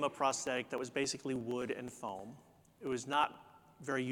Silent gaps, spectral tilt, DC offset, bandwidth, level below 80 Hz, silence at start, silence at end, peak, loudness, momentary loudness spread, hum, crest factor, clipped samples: none; -3.5 dB/octave; under 0.1%; 18 kHz; -74 dBFS; 0 s; 0 s; -18 dBFS; -38 LUFS; 14 LU; none; 22 dB; under 0.1%